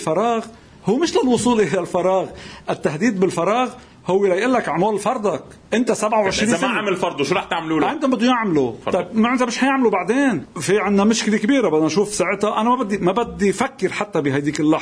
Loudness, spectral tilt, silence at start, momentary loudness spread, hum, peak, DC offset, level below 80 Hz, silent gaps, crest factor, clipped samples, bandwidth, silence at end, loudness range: -19 LUFS; -5 dB/octave; 0 s; 6 LU; none; -2 dBFS; under 0.1%; -52 dBFS; none; 16 dB; under 0.1%; 11 kHz; 0 s; 2 LU